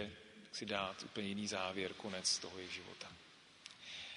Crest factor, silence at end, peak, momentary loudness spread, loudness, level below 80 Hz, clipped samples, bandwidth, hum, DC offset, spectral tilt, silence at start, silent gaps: 22 dB; 0 s; -22 dBFS; 19 LU; -42 LUFS; -76 dBFS; under 0.1%; 10.5 kHz; none; under 0.1%; -2.5 dB/octave; 0 s; none